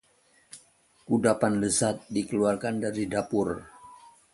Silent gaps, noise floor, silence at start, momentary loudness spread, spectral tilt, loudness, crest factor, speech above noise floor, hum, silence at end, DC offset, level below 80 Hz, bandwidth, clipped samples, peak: none; -64 dBFS; 0.55 s; 23 LU; -5 dB/octave; -27 LUFS; 20 dB; 37 dB; none; 0.25 s; under 0.1%; -58 dBFS; 11.5 kHz; under 0.1%; -8 dBFS